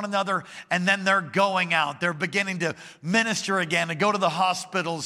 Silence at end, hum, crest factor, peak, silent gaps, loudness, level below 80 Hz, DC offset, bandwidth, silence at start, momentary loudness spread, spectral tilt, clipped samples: 0 s; none; 18 dB; -6 dBFS; none; -24 LUFS; -74 dBFS; under 0.1%; 15 kHz; 0 s; 6 LU; -4 dB/octave; under 0.1%